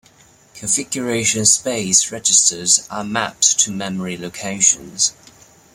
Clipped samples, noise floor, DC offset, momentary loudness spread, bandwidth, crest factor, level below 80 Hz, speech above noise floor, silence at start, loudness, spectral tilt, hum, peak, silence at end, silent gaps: under 0.1%; -50 dBFS; under 0.1%; 12 LU; 16.5 kHz; 20 dB; -56 dBFS; 32 dB; 0.55 s; -15 LUFS; -1.5 dB/octave; none; 0 dBFS; 0.6 s; none